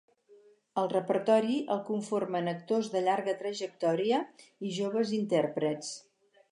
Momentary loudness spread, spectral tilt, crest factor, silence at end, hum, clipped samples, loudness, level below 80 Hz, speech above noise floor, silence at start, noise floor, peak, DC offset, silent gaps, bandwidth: 11 LU; -5.5 dB/octave; 18 dB; 0.5 s; none; under 0.1%; -31 LUFS; -86 dBFS; 30 dB; 0.3 s; -60 dBFS; -14 dBFS; under 0.1%; none; 11 kHz